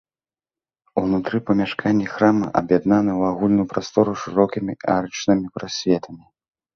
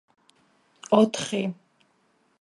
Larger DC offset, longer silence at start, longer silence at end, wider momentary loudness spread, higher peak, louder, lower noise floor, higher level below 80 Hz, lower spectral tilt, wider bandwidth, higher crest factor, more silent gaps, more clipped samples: neither; about the same, 0.95 s vs 0.9 s; second, 0.6 s vs 0.9 s; second, 6 LU vs 25 LU; first, -2 dBFS vs -6 dBFS; first, -20 LUFS vs -24 LUFS; first, under -90 dBFS vs -67 dBFS; first, -52 dBFS vs -72 dBFS; first, -6.5 dB/octave vs -5 dB/octave; second, 7 kHz vs 11.5 kHz; about the same, 18 dB vs 22 dB; neither; neither